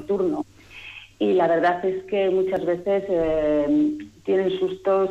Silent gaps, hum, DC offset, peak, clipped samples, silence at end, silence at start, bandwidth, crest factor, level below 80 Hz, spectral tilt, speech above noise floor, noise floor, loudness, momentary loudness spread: none; none; under 0.1%; -12 dBFS; under 0.1%; 0 s; 0 s; 8 kHz; 12 dB; -52 dBFS; -7.5 dB/octave; 20 dB; -42 dBFS; -22 LUFS; 14 LU